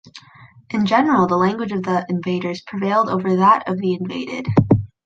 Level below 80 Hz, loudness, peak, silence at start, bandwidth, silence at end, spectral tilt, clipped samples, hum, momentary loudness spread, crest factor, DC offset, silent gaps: -46 dBFS; -19 LUFS; -2 dBFS; 0.05 s; 7.6 kHz; 0.2 s; -7.5 dB/octave; under 0.1%; none; 9 LU; 16 dB; under 0.1%; none